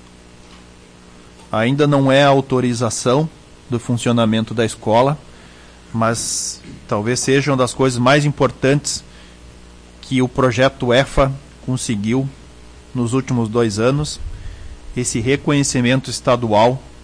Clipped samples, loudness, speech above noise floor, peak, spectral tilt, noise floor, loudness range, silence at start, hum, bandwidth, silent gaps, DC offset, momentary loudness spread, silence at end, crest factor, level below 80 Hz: under 0.1%; -17 LUFS; 26 dB; -4 dBFS; -5 dB/octave; -43 dBFS; 3 LU; 0.5 s; 60 Hz at -45 dBFS; 10.5 kHz; none; under 0.1%; 12 LU; 0.1 s; 14 dB; -38 dBFS